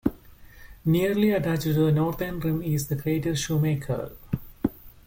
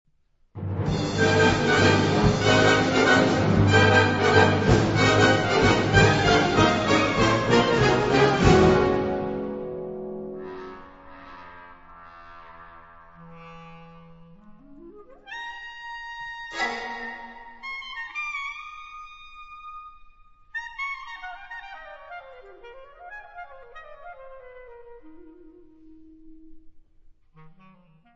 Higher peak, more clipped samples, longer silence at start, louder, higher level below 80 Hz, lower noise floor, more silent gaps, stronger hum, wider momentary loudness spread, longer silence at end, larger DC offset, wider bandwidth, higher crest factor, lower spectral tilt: second, -8 dBFS vs -4 dBFS; neither; second, 0.05 s vs 0.55 s; second, -26 LUFS vs -21 LUFS; about the same, -46 dBFS vs -42 dBFS; second, -48 dBFS vs -63 dBFS; neither; neither; second, 9 LU vs 24 LU; second, 0.2 s vs 0.65 s; neither; first, 17 kHz vs 8 kHz; second, 16 dB vs 22 dB; about the same, -6.5 dB/octave vs -5.5 dB/octave